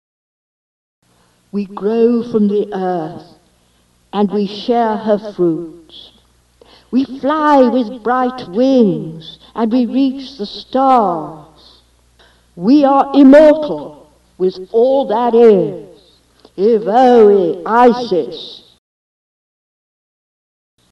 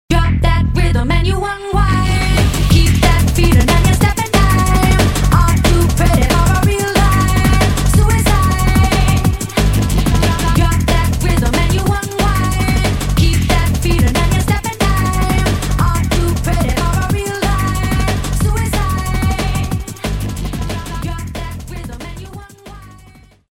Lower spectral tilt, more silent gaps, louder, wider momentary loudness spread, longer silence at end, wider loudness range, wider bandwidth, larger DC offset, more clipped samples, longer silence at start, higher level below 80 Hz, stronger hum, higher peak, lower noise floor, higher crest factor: first, -7.5 dB/octave vs -5.5 dB/octave; neither; about the same, -13 LUFS vs -14 LUFS; first, 17 LU vs 10 LU; first, 2.35 s vs 0.55 s; about the same, 7 LU vs 7 LU; second, 8 kHz vs 17 kHz; neither; neither; first, 1.55 s vs 0.1 s; second, -54 dBFS vs -18 dBFS; neither; about the same, 0 dBFS vs 0 dBFS; first, -55 dBFS vs -43 dBFS; about the same, 14 dB vs 12 dB